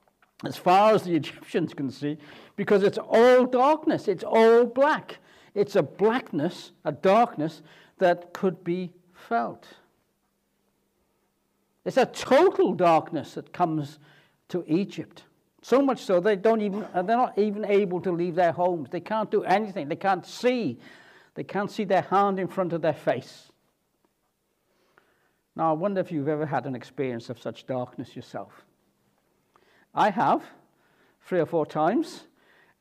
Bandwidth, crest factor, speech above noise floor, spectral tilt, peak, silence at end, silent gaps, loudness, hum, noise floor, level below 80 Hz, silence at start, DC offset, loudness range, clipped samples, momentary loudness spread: 14.5 kHz; 16 dB; 49 dB; -6.5 dB/octave; -10 dBFS; 0.6 s; none; -25 LUFS; none; -74 dBFS; -76 dBFS; 0.45 s; under 0.1%; 10 LU; under 0.1%; 15 LU